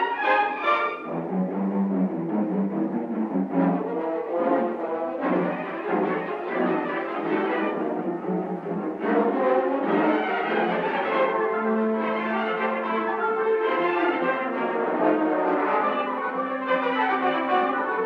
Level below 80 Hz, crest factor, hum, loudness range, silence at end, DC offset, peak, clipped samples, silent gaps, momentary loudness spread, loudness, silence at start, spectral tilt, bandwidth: -72 dBFS; 16 dB; none; 3 LU; 0 s; under 0.1%; -8 dBFS; under 0.1%; none; 6 LU; -25 LUFS; 0 s; -8.5 dB/octave; 6.2 kHz